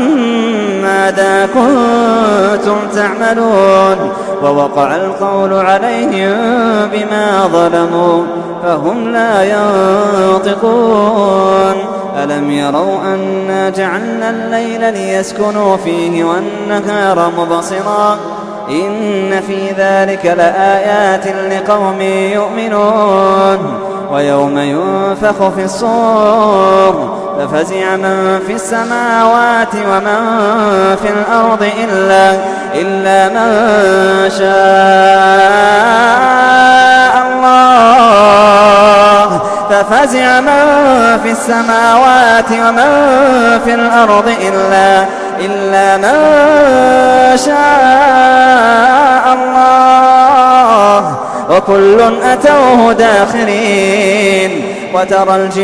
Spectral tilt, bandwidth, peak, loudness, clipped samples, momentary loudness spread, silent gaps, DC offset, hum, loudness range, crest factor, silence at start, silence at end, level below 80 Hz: -4.5 dB/octave; 11 kHz; 0 dBFS; -9 LUFS; 0.6%; 9 LU; none; under 0.1%; none; 7 LU; 8 dB; 0 s; 0 s; -44 dBFS